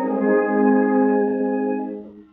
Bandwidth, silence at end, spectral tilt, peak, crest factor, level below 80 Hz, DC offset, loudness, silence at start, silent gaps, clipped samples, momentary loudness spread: 2.8 kHz; 0.1 s; -12 dB/octave; -6 dBFS; 14 dB; -66 dBFS; under 0.1%; -19 LUFS; 0 s; none; under 0.1%; 11 LU